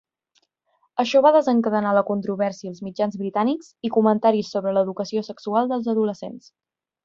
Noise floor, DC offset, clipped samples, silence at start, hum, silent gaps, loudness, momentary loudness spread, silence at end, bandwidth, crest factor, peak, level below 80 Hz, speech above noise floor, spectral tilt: -68 dBFS; under 0.1%; under 0.1%; 0.95 s; none; none; -22 LUFS; 11 LU; 0.65 s; 7.4 kHz; 18 dB; -4 dBFS; -68 dBFS; 47 dB; -6.5 dB/octave